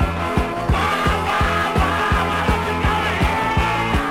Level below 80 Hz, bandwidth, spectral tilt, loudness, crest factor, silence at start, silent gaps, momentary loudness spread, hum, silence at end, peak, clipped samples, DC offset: -26 dBFS; 16.5 kHz; -5.5 dB/octave; -19 LUFS; 14 dB; 0 s; none; 2 LU; none; 0 s; -6 dBFS; under 0.1%; under 0.1%